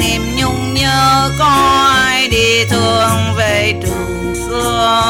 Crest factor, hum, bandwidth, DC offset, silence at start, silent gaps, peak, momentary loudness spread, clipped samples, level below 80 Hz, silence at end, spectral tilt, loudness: 12 dB; none; 17 kHz; 0.2%; 0 s; none; -2 dBFS; 9 LU; under 0.1%; -28 dBFS; 0 s; -3.5 dB/octave; -12 LUFS